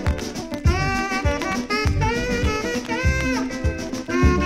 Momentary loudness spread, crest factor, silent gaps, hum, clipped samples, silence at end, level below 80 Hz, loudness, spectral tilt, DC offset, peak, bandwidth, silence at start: 5 LU; 16 dB; none; none; under 0.1%; 0 s; -28 dBFS; -23 LUFS; -5.5 dB/octave; under 0.1%; -4 dBFS; 14.5 kHz; 0 s